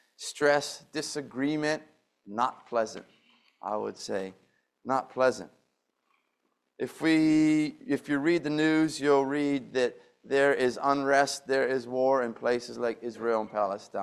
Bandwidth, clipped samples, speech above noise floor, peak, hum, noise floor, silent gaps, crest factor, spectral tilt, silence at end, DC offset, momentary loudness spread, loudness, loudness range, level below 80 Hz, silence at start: 13 kHz; under 0.1%; 50 dB; -10 dBFS; none; -78 dBFS; none; 20 dB; -4.5 dB/octave; 0 s; under 0.1%; 11 LU; -28 LUFS; 7 LU; -72 dBFS; 0.2 s